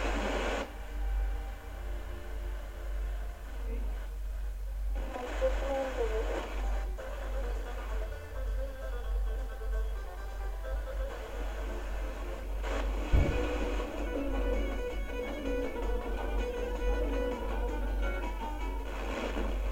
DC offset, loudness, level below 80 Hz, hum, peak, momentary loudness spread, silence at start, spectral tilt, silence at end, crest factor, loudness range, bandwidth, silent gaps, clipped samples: under 0.1%; -37 LUFS; -34 dBFS; none; -14 dBFS; 8 LU; 0 s; -6 dB/octave; 0 s; 20 dB; 6 LU; 16 kHz; none; under 0.1%